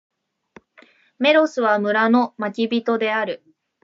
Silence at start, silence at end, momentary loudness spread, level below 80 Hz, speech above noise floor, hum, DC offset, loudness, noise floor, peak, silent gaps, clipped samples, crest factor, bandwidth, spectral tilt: 1.2 s; 0.5 s; 8 LU; -78 dBFS; 34 dB; none; under 0.1%; -19 LUFS; -53 dBFS; -4 dBFS; none; under 0.1%; 18 dB; 7.6 kHz; -5.5 dB/octave